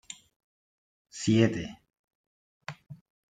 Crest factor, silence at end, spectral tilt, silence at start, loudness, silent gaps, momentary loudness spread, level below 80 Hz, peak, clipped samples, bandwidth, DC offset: 24 dB; 0.4 s; -6 dB/octave; 0.1 s; -27 LUFS; 0.36-1.05 s, 1.99-2.08 s, 2.15-2.60 s; 22 LU; -64 dBFS; -8 dBFS; under 0.1%; 9.4 kHz; under 0.1%